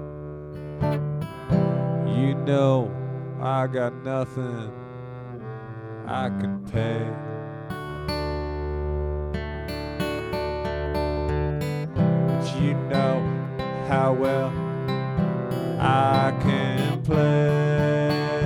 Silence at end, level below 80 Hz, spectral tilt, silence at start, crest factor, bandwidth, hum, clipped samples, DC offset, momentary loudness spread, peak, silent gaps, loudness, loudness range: 0 s; -40 dBFS; -8 dB/octave; 0 s; 16 dB; 16.5 kHz; none; under 0.1%; under 0.1%; 14 LU; -8 dBFS; none; -25 LUFS; 7 LU